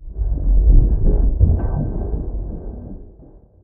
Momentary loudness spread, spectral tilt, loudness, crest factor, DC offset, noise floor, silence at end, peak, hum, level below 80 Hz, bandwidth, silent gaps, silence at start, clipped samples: 18 LU; -16 dB/octave; -20 LUFS; 16 dB; under 0.1%; -44 dBFS; 0.55 s; 0 dBFS; none; -18 dBFS; 1.6 kHz; none; 0 s; under 0.1%